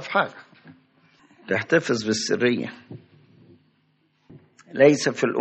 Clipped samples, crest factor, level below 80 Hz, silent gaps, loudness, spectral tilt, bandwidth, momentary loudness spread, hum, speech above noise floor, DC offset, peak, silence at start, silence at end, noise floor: under 0.1%; 22 dB; -70 dBFS; none; -22 LUFS; -4.5 dB/octave; 8.4 kHz; 21 LU; none; 44 dB; under 0.1%; -4 dBFS; 0 s; 0 s; -66 dBFS